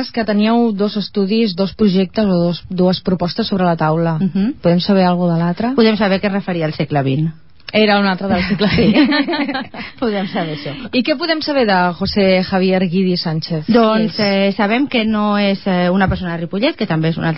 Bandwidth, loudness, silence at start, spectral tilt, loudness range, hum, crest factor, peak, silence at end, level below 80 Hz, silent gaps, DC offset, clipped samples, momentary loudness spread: 5.8 kHz; -15 LUFS; 0 s; -10.5 dB/octave; 2 LU; none; 14 dB; 0 dBFS; 0 s; -40 dBFS; none; 0.8%; under 0.1%; 7 LU